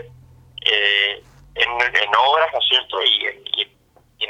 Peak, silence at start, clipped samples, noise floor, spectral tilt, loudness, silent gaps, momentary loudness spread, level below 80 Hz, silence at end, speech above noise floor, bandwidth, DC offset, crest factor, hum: 0 dBFS; 0 s; under 0.1%; -46 dBFS; -1.5 dB/octave; -17 LUFS; none; 8 LU; -54 dBFS; 0 s; 28 dB; 14.5 kHz; under 0.1%; 20 dB; none